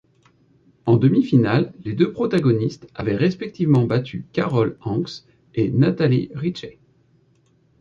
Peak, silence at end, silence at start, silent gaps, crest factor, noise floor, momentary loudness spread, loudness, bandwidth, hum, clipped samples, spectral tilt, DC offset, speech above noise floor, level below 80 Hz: -4 dBFS; 1.1 s; 0.85 s; none; 16 dB; -60 dBFS; 11 LU; -20 LUFS; 7.2 kHz; none; under 0.1%; -8.5 dB/octave; under 0.1%; 40 dB; -54 dBFS